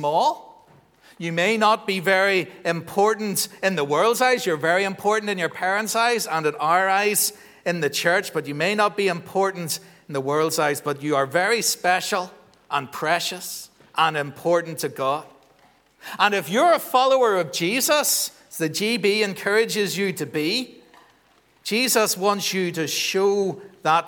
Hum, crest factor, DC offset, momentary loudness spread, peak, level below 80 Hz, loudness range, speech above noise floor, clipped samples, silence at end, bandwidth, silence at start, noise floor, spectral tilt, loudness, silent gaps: none; 20 dB; under 0.1%; 10 LU; -2 dBFS; -74 dBFS; 3 LU; 37 dB; under 0.1%; 0 s; over 20 kHz; 0 s; -59 dBFS; -3 dB/octave; -22 LUFS; none